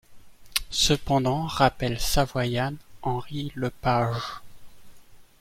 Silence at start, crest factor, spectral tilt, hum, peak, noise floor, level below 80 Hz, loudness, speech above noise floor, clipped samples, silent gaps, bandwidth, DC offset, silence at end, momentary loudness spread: 0.1 s; 24 dB; -4.5 dB/octave; none; -2 dBFS; -48 dBFS; -40 dBFS; -26 LUFS; 23 dB; under 0.1%; none; 16.5 kHz; under 0.1%; 0.2 s; 10 LU